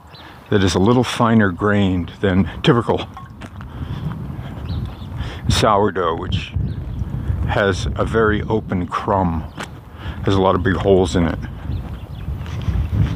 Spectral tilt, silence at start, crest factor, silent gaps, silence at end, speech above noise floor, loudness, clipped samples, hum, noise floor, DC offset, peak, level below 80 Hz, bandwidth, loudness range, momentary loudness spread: -6.5 dB/octave; 0.05 s; 18 dB; none; 0 s; 23 dB; -19 LUFS; under 0.1%; none; -39 dBFS; under 0.1%; -2 dBFS; -30 dBFS; 15.5 kHz; 5 LU; 16 LU